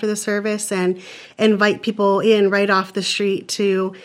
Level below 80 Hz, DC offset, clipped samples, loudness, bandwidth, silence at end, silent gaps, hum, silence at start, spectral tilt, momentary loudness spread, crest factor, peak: -70 dBFS; under 0.1%; under 0.1%; -18 LUFS; 15 kHz; 0 s; none; none; 0 s; -4 dB/octave; 6 LU; 18 dB; -2 dBFS